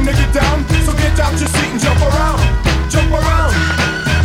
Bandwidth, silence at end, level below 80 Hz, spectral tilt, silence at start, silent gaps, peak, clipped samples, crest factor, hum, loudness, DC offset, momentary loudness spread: 16.5 kHz; 0 s; -16 dBFS; -5 dB/octave; 0 s; none; 0 dBFS; under 0.1%; 12 dB; none; -14 LUFS; under 0.1%; 2 LU